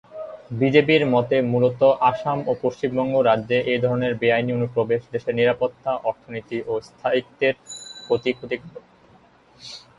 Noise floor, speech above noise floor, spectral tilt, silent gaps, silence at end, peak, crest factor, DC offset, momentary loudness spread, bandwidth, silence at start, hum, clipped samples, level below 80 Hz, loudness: -53 dBFS; 32 dB; -6.5 dB/octave; none; 0.2 s; -2 dBFS; 18 dB; under 0.1%; 15 LU; 11 kHz; 0.1 s; none; under 0.1%; -60 dBFS; -21 LUFS